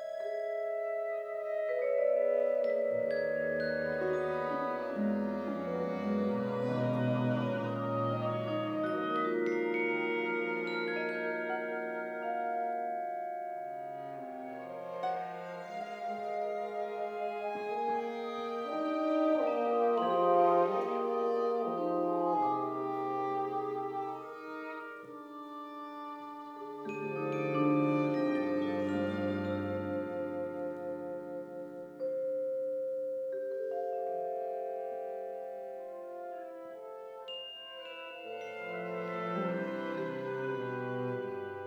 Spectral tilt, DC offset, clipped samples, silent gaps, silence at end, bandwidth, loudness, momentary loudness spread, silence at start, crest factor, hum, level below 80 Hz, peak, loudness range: -8 dB/octave; under 0.1%; under 0.1%; none; 0 s; 19.5 kHz; -35 LUFS; 13 LU; 0 s; 18 dB; none; -78 dBFS; -16 dBFS; 10 LU